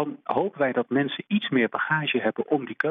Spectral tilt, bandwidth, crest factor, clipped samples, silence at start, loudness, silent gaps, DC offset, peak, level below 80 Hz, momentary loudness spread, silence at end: -8.5 dB/octave; 5.2 kHz; 16 dB; under 0.1%; 0 s; -25 LUFS; none; under 0.1%; -8 dBFS; -74 dBFS; 4 LU; 0 s